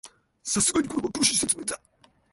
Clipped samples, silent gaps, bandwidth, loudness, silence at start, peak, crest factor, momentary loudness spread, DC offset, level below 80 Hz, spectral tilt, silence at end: under 0.1%; none; 12 kHz; -24 LUFS; 0.05 s; -8 dBFS; 20 dB; 13 LU; under 0.1%; -56 dBFS; -2 dB/octave; 0.55 s